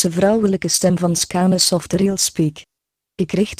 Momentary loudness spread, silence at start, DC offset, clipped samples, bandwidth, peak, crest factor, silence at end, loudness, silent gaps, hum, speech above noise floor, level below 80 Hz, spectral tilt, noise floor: 7 LU; 0 s; under 0.1%; under 0.1%; 15.5 kHz; 0 dBFS; 18 dB; 0.05 s; -17 LUFS; none; none; 40 dB; -48 dBFS; -4.5 dB/octave; -57 dBFS